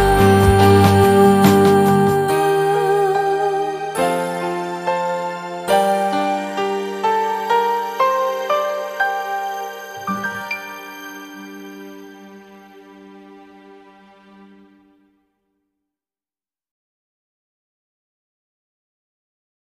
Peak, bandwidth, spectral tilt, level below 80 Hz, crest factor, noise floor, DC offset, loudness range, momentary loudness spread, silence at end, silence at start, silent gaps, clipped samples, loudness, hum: 0 dBFS; 15.5 kHz; -6 dB/octave; -38 dBFS; 18 dB; under -90 dBFS; under 0.1%; 19 LU; 20 LU; 6.3 s; 0 s; none; under 0.1%; -17 LUFS; none